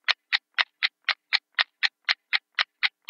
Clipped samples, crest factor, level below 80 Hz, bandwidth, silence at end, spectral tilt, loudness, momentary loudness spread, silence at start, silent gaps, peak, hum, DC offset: under 0.1%; 26 dB; under -90 dBFS; 16.5 kHz; 0.2 s; 5.5 dB/octave; -25 LUFS; 3 LU; 0.1 s; none; -2 dBFS; none; under 0.1%